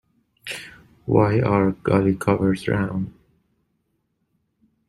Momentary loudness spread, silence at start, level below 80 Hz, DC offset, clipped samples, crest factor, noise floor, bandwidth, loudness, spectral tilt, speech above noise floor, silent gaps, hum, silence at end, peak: 16 LU; 0.45 s; -50 dBFS; under 0.1%; under 0.1%; 20 dB; -72 dBFS; 13.5 kHz; -21 LUFS; -7.5 dB/octave; 52 dB; none; none; 1.8 s; -2 dBFS